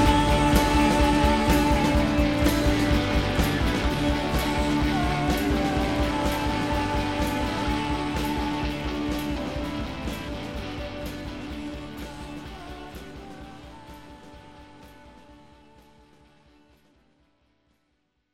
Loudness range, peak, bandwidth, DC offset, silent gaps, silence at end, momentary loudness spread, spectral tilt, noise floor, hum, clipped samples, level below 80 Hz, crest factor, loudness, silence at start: 19 LU; -6 dBFS; 16 kHz; 0.2%; none; 3 s; 19 LU; -5.5 dB/octave; -73 dBFS; none; under 0.1%; -32 dBFS; 20 dB; -25 LUFS; 0 s